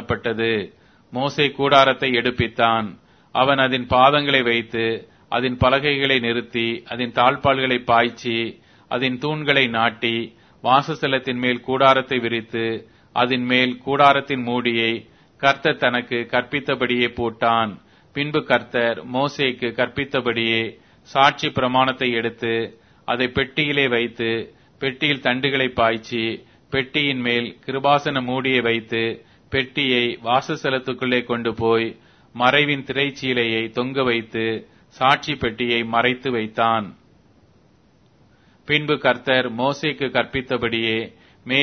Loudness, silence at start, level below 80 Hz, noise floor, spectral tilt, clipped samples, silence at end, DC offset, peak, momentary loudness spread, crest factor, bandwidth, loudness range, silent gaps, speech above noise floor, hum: -20 LUFS; 0 s; -52 dBFS; -56 dBFS; -5.5 dB/octave; under 0.1%; 0 s; under 0.1%; 0 dBFS; 9 LU; 20 dB; 6.6 kHz; 3 LU; none; 36 dB; none